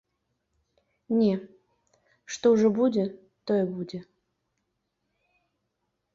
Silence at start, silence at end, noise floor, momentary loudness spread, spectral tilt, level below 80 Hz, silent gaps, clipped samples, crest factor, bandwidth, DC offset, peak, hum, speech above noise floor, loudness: 1.1 s; 2.15 s; -79 dBFS; 17 LU; -6.5 dB/octave; -70 dBFS; none; under 0.1%; 18 dB; 7.6 kHz; under 0.1%; -10 dBFS; none; 55 dB; -26 LUFS